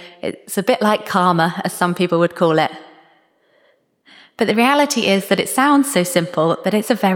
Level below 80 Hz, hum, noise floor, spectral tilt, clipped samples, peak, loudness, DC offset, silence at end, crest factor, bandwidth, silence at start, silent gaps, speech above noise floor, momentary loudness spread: -68 dBFS; none; -59 dBFS; -4.5 dB/octave; under 0.1%; -2 dBFS; -16 LUFS; under 0.1%; 0 s; 16 dB; 19 kHz; 0 s; none; 42 dB; 7 LU